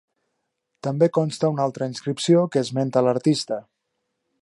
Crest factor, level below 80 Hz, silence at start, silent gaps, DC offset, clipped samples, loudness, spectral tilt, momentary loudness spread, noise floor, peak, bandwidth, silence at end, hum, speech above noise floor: 18 dB; -70 dBFS; 0.85 s; none; under 0.1%; under 0.1%; -22 LUFS; -6.5 dB/octave; 10 LU; -77 dBFS; -6 dBFS; 11.5 kHz; 0.8 s; none; 56 dB